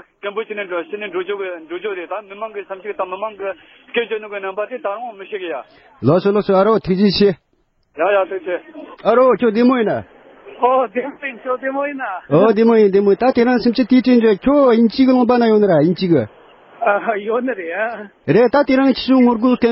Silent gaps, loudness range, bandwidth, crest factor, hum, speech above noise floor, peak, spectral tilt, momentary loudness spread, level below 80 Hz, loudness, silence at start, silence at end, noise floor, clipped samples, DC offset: none; 12 LU; 5.8 kHz; 14 dB; none; 45 dB; -2 dBFS; -10.5 dB/octave; 14 LU; -52 dBFS; -16 LUFS; 0.25 s; 0 s; -60 dBFS; under 0.1%; under 0.1%